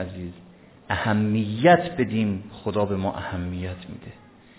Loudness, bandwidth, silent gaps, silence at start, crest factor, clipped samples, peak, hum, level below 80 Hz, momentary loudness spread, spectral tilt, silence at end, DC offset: -24 LUFS; 4 kHz; none; 0 s; 22 dB; under 0.1%; -4 dBFS; none; -46 dBFS; 20 LU; -11 dB/octave; 0.45 s; under 0.1%